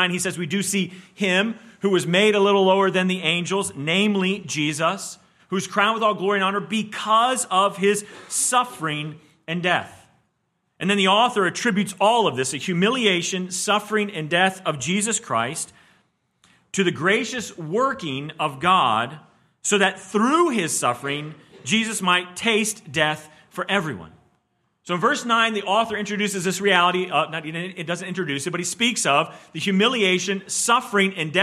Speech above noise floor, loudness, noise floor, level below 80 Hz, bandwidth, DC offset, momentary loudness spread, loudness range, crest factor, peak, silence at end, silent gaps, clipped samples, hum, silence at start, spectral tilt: 50 dB; -21 LUFS; -72 dBFS; -68 dBFS; 14.5 kHz; under 0.1%; 11 LU; 4 LU; 20 dB; -4 dBFS; 0 s; none; under 0.1%; none; 0 s; -3.5 dB/octave